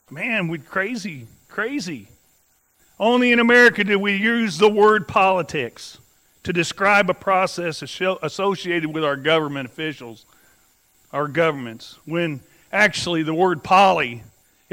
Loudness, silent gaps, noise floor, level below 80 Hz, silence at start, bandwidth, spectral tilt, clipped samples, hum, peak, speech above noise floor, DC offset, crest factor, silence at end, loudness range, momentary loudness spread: -19 LUFS; none; -62 dBFS; -60 dBFS; 0.1 s; 16 kHz; -4.5 dB/octave; under 0.1%; none; -2 dBFS; 42 dB; under 0.1%; 18 dB; 0.5 s; 8 LU; 18 LU